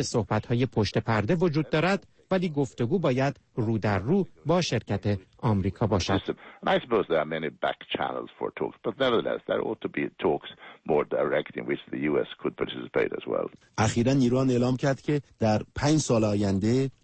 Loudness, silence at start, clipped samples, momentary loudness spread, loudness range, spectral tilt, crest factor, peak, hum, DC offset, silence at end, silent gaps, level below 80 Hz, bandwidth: -27 LUFS; 0 s; under 0.1%; 8 LU; 4 LU; -6 dB/octave; 14 dB; -12 dBFS; none; under 0.1%; 0.15 s; none; -52 dBFS; 8.8 kHz